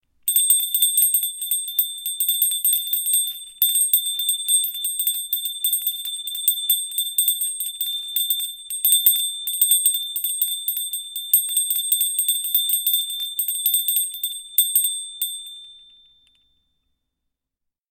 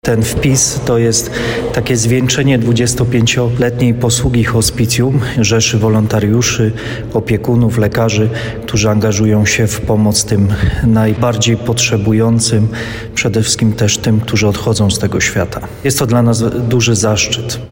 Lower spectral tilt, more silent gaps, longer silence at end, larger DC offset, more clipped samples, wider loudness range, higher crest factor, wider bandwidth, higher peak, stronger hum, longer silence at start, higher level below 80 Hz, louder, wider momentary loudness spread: second, 6.5 dB/octave vs -4.5 dB/octave; neither; first, 2.1 s vs 0.05 s; neither; neither; about the same, 3 LU vs 1 LU; first, 20 dB vs 10 dB; about the same, 17 kHz vs 16.5 kHz; about the same, -2 dBFS vs -2 dBFS; neither; first, 0.25 s vs 0.05 s; second, -70 dBFS vs -30 dBFS; second, -19 LUFS vs -12 LUFS; first, 9 LU vs 5 LU